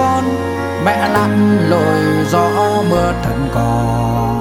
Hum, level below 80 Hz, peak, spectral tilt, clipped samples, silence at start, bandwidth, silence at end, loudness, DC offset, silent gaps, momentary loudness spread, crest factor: none; -30 dBFS; 0 dBFS; -6.5 dB/octave; under 0.1%; 0 s; 17.5 kHz; 0 s; -14 LUFS; under 0.1%; none; 5 LU; 12 dB